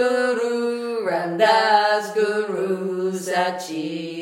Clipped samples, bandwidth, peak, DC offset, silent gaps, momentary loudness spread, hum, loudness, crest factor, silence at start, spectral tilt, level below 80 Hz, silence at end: under 0.1%; 16 kHz; -2 dBFS; under 0.1%; none; 9 LU; none; -21 LUFS; 18 dB; 0 s; -4 dB/octave; -88 dBFS; 0 s